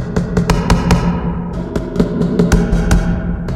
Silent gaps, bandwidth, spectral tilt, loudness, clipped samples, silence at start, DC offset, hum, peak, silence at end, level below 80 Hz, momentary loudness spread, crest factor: none; 13 kHz; -6.5 dB/octave; -16 LUFS; under 0.1%; 0 s; under 0.1%; none; 0 dBFS; 0 s; -20 dBFS; 8 LU; 14 dB